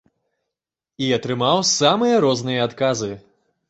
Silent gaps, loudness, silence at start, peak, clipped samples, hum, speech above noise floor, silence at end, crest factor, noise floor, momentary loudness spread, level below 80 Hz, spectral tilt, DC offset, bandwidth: none; -19 LUFS; 1 s; -2 dBFS; under 0.1%; none; 67 dB; 0.5 s; 20 dB; -86 dBFS; 10 LU; -60 dBFS; -4 dB/octave; under 0.1%; 8.2 kHz